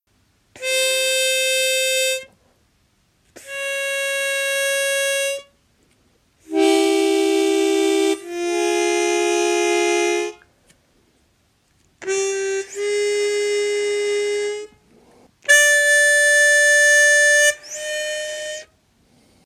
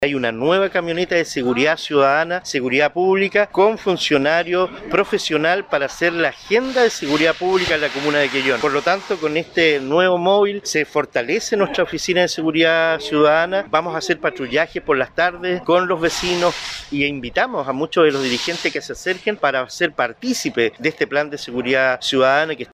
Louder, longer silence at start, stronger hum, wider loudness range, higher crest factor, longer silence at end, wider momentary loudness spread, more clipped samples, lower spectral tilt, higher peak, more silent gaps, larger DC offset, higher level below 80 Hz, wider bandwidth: about the same, -17 LUFS vs -18 LUFS; first, 0.55 s vs 0 s; neither; first, 9 LU vs 3 LU; about the same, 20 dB vs 18 dB; first, 0.8 s vs 0.1 s; first, 15 LU vs 5 LU; neither; second, 0.5 dB/octave vs -4 dB/octave; about the same, 0 dBFS vs 0 dBFS; neither; neither; second, -68 dBFS vs -52 dBFS; about the same, 16 kHz vs 15 kHz